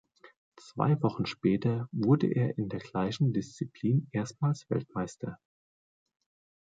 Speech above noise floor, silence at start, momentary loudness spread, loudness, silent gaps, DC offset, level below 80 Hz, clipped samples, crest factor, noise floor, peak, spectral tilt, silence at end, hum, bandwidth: over 60 dB; 0.25 s; 11 LU; -30 LUFS; 0.36-0.52 s; under 0.1%; -64 dBFS; under 0.1%; 18 dB; under -90 dBFS; -12 dBFS; -7.5 dB/octave; 1.25 s; none; 7.8 kHz